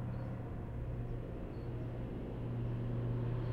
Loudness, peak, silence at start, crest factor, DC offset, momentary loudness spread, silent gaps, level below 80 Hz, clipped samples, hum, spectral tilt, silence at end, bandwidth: -42 LUFS; -28 dBFS; 0 s; 12 dB; under 0.1%; 6 LU; none; -48 dBFS; under 0.1%; none; -10 dB/octave; 0 s; 4.6 kHz